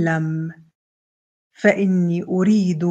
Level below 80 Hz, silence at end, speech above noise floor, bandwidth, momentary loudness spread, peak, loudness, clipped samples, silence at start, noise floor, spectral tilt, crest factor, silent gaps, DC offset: -66 dBFS; 0 s; over 72 dB; 8 kHz; 9 LU; -2 dBFS; -19 LUFS; under 0.1%; 0 s; under -90 dBFS; -8 dB/octave; 18 dB; 0.75-1.50 s; under 0.1%